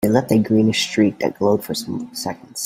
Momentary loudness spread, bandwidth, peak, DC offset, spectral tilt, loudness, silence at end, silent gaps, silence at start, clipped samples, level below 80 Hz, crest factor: 11 LU; 16.5 kHz; 0 dBFS; under 0.1%; -5 dB/octave; -19 LUFS; 0 s; none; 0 s; under 0.1%; -56 dBFS; 18 dB